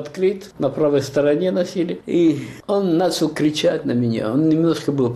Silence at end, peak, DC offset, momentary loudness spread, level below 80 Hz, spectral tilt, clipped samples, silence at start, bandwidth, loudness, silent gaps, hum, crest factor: 0 s; -8 dBFS; under 0.1%; 5 LU; -56 dBFS; -6.5 dB/octave; under 0.1%; 0 s; 13.5 kHz; -19 LUFS; none; none; 12 dB